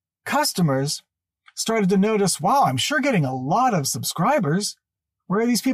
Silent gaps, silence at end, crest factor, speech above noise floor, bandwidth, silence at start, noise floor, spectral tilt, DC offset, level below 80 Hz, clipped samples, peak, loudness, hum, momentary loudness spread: none; 0 s; 12 dB; 34 dB; 15.5 kHz; 0.25 s; -54 dBFS; -4.5 dB/octave; under 0.1%; -64 dBFS; under 0.1%; -10 dBFS; -21 LUFS; none; 8 LU